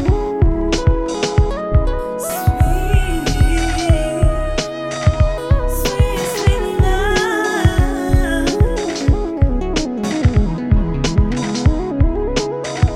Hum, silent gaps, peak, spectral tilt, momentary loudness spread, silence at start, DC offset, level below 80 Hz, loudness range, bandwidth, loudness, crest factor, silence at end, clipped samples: none; none; 0 dBFS; -6 dB/octave; 4 LU; 0 s; under 0.1%; -18 dBFS; 1 LU; 17 kHz; -17 LUFS; 14 dB; 0 s; under 0.1%